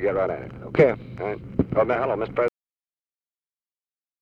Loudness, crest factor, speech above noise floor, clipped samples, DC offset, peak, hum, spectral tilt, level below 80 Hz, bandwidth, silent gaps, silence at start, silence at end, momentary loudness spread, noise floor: -24 LUFS; 22 dB; over 67 dB; under 0.1%; under 0.1%; -4 dBFS; none; -9 dB/octave; -50 dBFS; 6.8 kHz; none; 0 s; 1.75 s; 11 LU; under -90 dBFS